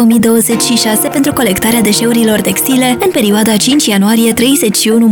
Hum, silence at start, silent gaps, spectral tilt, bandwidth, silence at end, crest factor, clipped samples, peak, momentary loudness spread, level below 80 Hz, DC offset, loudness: none; 0 s; none; -3.5 dB/octave; over 20 kHz; 0 s; 8 dB; under 0.1%; 0 dBFS; 2 LU; -42 dBFS; 0.2%; -9 LUFS